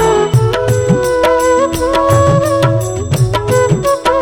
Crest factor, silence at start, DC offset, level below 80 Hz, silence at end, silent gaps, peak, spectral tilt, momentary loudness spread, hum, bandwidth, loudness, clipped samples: 12 dB; 0 s; under 0.1%; -32 dBFS; 0 s; none; 0 dBFS; -6 dB/octave; 4 LU; none; 17 kHz; -12 LUFS; under 0.1%